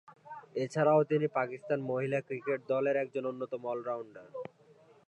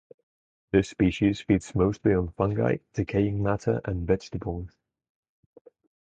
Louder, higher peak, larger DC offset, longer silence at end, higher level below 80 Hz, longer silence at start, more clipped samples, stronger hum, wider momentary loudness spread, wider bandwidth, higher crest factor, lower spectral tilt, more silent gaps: second, -33 LUFS vs -26 LUFS; second, -14 dBFS vs -8 dBFS; neither; second, 0.65 s vs 1.35 s; second, -84 dBFS vs -44 dBFS; second, 0.1 s vs 0.75 s; neither; neither; first, 18 LU vs 9 LU; first, 10 kHz vs 9 kHz; about the same, 18 dB vs 20 dB; about the same, -7.5 dB/octave vs -7.5 dB/octave; neither